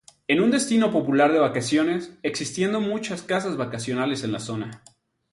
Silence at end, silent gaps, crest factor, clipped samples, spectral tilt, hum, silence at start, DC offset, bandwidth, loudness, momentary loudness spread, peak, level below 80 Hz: 0.55 s; none; 16 dB; under 0.1%; -5 dB/octave; none; 0.3 s; under 0.1%; 11.5 kHz; -23 LUFS; 10 LU; -6 dBFS; -64 dBFS